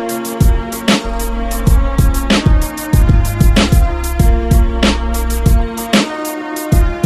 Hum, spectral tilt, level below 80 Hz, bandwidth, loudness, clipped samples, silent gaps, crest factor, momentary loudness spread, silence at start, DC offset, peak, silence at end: none; -5.5 dB/octave; -14 dBFS; 15 kHz; -14 LUFS; under 0.1%; none; 12 dB; 7 LU; 0 s; under 0.1%; 0 dBFS; 0 s